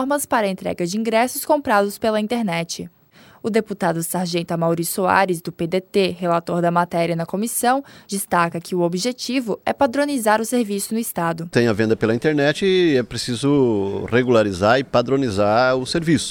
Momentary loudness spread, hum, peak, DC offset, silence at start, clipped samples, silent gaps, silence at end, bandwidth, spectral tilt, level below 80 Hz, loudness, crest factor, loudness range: 7 LU; none; 0 dBFS; under 0.1%; 0 s; under 0.1%; none; 0 s; over 20 kHz; -5 dB/octave; -54 dBFS; -20 LUFS; 18 dB; 3 LU